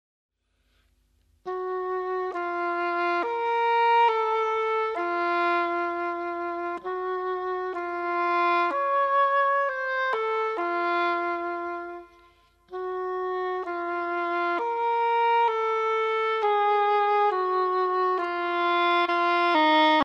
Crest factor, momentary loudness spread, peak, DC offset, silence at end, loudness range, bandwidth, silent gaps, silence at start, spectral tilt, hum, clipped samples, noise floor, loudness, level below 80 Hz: 16 dB; 9 LU; -10 dBFS; under 0.1%; 0 s; 6 LU; 7.4 kHz; none; 1.45 s; -3.5 dB/octave; none; under 0.1%; -70 dBFS; -25 LUFS; -68 dBFS